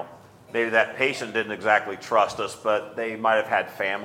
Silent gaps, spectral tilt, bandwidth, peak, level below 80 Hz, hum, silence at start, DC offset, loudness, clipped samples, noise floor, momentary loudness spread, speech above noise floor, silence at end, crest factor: none; -3.5 dB/octave; 16.5 kHz; -4 dBFS; -68 dBFS; none; 0 s; under 0.1%; -24 LUFS; under 0.1%; -47 dBFS; 6 LU; 23 dB; 0 s; 20 dB